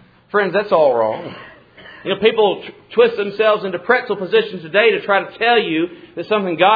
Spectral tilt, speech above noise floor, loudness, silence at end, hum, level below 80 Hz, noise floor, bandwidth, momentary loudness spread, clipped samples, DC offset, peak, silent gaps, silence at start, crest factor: -7.5 dB/octave; 25 dB; -17 LUFS; 0 s; none; -62 dBFS; -41 dBFS; 5 kHz; 11 LU; under 0.1%; under 0.1%; 0 dBFS; none; 0.35 s; 16 dB